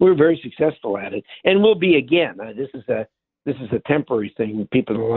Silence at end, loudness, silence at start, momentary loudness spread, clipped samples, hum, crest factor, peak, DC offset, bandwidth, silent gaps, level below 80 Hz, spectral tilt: 0 s; -20 LUFS; 0 s; 15 LU; under 0.1%; none; 18 dB; 0 dBFS; under 0.1%; 4.2 kHz; none; -56 dBFS; -11 dB/octave